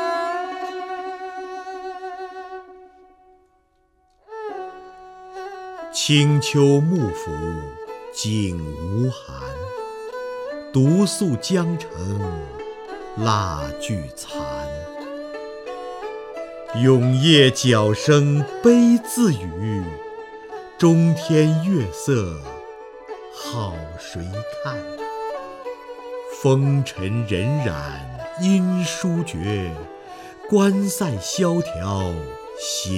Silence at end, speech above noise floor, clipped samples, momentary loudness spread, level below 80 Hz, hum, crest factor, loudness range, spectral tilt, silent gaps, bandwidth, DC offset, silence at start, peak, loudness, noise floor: 0 s; 43 dB; under 0.1%; 18 LU; -46 dBFS; none; 22 dB; 14 LU; -5.5 dB/octave; none; 16 kHz; under 0.1%; 0 s; 0 dBFS; -21 LUFS; -62 dBFS